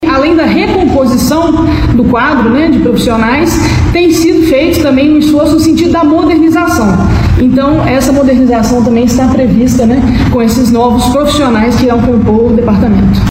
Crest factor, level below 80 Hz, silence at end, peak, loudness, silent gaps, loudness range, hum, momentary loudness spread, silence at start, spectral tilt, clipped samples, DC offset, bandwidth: 6 dB; -20 dBFS; 0 s; 0 dBFS; -8 LUFS; none; 1 LU; none; 2 LU; 0 s; -6 dB/octave; under 0.1%; under 0.1%; 16.5 kHz